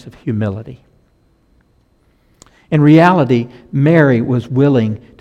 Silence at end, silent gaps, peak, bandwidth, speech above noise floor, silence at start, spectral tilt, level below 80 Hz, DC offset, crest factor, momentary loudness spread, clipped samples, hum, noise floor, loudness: 0.25 s; none; 0 dBFS; 8 kHz; 43 dB; 0.05 s; -9 dB/octave; -50 dBFS; under 0.1%; 14 dB; 14 LU; under 0.1%; none; -55 dBFS; -13 LUFS